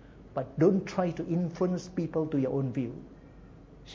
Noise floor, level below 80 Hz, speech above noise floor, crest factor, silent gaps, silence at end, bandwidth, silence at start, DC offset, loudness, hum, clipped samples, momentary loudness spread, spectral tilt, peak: -51 dBFS; -56 dBFS; 22 dB; 20 dB; none; 0 s; 7.6 kHz; 0 s; under 0.1%; -30 LUFS; none; under 0.1%; 13 LU; -8 dB/octave; -12 dBFS